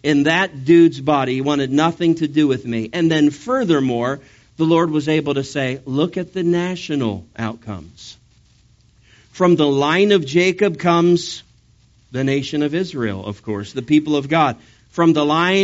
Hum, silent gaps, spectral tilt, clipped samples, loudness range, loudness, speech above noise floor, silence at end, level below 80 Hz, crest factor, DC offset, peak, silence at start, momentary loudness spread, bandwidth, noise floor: none; none; -5 dB/octave; under 0.1%; 6 LU; -18 LUFS; 36 dB; 0 s; -54 dBFS; 16 dB; under 0.1%; -2 dBFS; 0.05 s; 13 LU; 8 kHz; -53 dBFS